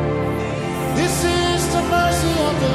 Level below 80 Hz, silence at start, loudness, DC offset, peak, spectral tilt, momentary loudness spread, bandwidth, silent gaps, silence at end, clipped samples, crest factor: -34 dBFS; 0 s; -19 LUFS; under 0.1%; -6 dBFS; -4.5 dB/octave; 6 LU; 16 kHz; none; 0 s; under 0.1%; 12 dB